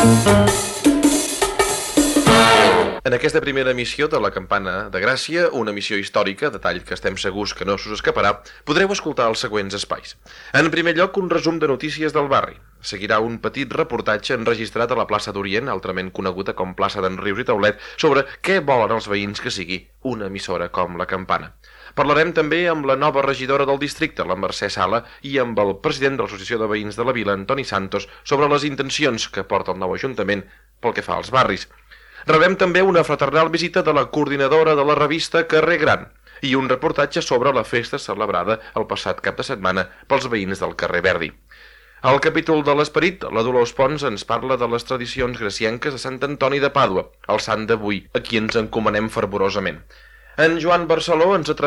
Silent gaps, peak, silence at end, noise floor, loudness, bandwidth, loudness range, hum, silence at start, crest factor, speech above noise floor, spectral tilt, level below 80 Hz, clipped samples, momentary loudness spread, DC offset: none; -4 dBFS; 0 s; -46 dBFS; -19 LUFS; 13.5 kHz; 5 LU; none; 0 s; 16 dB; 26 dB; -4.5 dB/octave; -46 dBFS; under 0.1%; 9 LU; under 0.1%